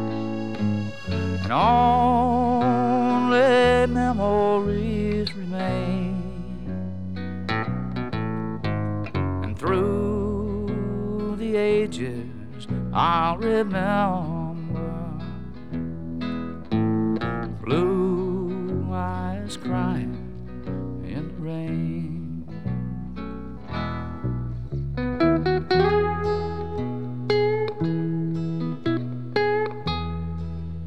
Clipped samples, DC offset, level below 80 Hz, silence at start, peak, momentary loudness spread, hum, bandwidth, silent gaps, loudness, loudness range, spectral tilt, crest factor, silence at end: under 0.1%; 1%; -42 dBFS; 0 s; -6 dBFS; 12 LU; none; 11 kHz; none; -25 LUFS; 9 LU; -7.5 dB/octave; 18 dB; 0 s